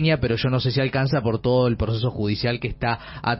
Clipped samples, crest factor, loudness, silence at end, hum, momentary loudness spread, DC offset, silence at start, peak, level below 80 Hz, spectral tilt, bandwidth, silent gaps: under 0.1%; 14 dB; -23 LUFS; 0 s; none; 5 LU; under 0.1%; 0 s; -8 dBFS; -40 dBFS; -5.5 dB/octave; 5.8 kHz; none